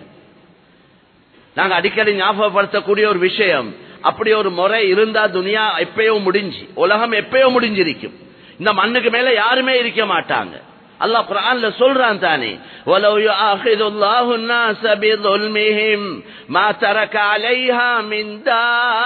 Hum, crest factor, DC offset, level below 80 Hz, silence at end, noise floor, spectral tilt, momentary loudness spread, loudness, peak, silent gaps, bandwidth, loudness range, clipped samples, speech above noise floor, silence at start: none; 16 dB; under 0.1%; -64 dBFS; 0 s; -51 dBFS; -6.5 dB/octave; 7 LU; -15 LUFS; 0 dBFS; none; 4.6 kHz; 1 LU; under 0.1%; 36 dB; 0 s